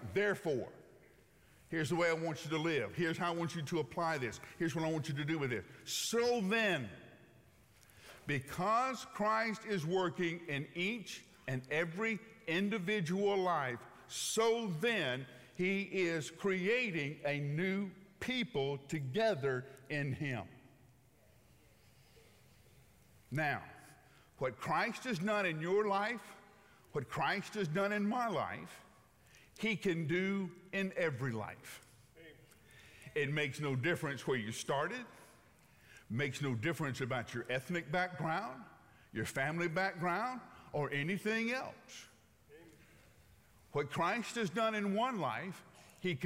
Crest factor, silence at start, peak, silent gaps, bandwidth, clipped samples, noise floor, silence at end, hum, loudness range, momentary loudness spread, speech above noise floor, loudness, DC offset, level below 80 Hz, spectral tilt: 16 dB; 0 s; -22 dBFS; none; 16 kHz; under 0.1%; -67 dBFS; 0 s; none; 5 LU; 11 LU; 30 dB; -37 LUFS; under 0.1%; -74 dBFS; -5 dB/octave